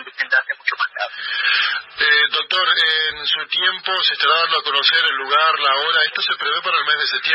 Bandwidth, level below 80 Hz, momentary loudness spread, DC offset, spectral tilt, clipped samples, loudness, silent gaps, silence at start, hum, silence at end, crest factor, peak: 9.8 kHz; -66 dBFS; 6 LU; under 0.1%; -1 dB/octave; under 0.1%; -16 LUFS; none; 0 s; none; 0 s; 14 dB; -4 dBFS